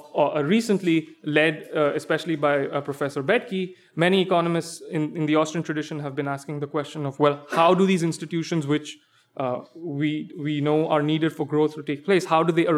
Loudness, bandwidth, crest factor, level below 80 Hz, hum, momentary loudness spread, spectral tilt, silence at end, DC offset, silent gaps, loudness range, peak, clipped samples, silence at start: -24 LUFS; 14.5 kHz; 18 dB; -76 dBFS; none; 10 LU; -6 dB/octave; 0 s; under 0.1%; none; 2 LU; -6 dBFS; under 0.1%; 0.05 s